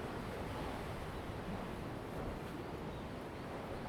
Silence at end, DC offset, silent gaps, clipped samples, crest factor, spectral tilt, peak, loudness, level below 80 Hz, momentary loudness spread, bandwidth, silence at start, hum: 0 s; under 0.1%; none; under 0.1%; 14 dB; -6.5 dB/octave; -30 dBFS; -45 LUFS; -54 dBFS; 3 LU; over 20 kHz; 0 s; none